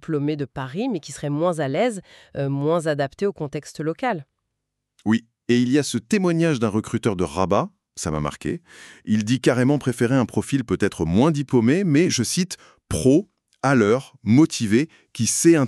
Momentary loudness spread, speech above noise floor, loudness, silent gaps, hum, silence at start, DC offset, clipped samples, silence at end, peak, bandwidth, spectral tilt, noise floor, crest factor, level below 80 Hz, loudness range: 11 LU; 59 dB; -22 LUFS; none; none; 0.1 s; under 0.1%; under 0.1%; 0 s; -4 dBFS; 13.5 kHz; -5.5 dB/octave; -79 dBFS; 18 dB; -50 dBFS; 5 LU